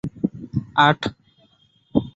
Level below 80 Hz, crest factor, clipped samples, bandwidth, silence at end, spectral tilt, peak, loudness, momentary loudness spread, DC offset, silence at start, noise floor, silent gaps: -50 dBFS; 20 dB; under 0.1%; 8 kHz; 0.05 s; -6.5 dB/octave; -2 dBFS; -21 LUFS; 12 LU; under 0.1%; 0.05 s; -59 dBFS; none